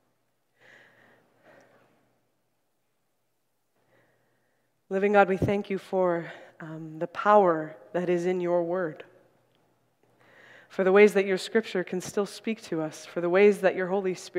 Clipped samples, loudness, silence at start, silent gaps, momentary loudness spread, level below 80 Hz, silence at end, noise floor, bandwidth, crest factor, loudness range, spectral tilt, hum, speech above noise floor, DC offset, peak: under 0.1%; -25 LUFS; 4.9 s; none; 15 LU; -64 dBFS; 0 s; -78 dBFS; 13.5 kHz; 24 dB; 5 LU; -6 dB/octave; none; 53 dB; under 0.1%; -4 dBFS